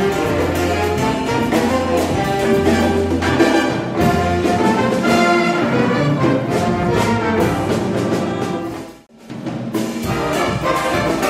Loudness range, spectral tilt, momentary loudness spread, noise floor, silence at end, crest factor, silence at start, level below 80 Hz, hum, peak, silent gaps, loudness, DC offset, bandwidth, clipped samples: 5 LU; -5.5 dB/octave; 8 LU; -37 dBFS; 0 s; 16 dB; 0 s; -38 dBFS; none; 0 dBFS; none; -17 LUFS; under 0.1%; 16 kHz; under 0.1%